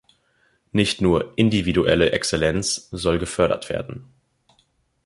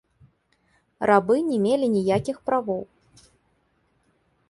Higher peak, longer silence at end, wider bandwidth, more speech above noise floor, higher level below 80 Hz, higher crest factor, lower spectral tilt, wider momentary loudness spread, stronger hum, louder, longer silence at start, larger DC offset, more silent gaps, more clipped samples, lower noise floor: about the same, -2 dBFS vs -4 dBFS; second, 1.05 s vs 1.65 s; about the same, 11.5 kHz vs 11.5 kHz; about the same, 44 dB vs 46 dB; first, -42 dBFS vs -60 dBFS; about the same, 20 dB vs 22 dB; second, -4.5 dB/octave vs -7 dB/octave; about the same, 9 LU vs 11 LU; neither; about the same, -21 LUFS vs -23 LUFS; second, 0.75 s vs 1 s; neither; neither; neither; about the same, -65 dBFS vs -67 dBFS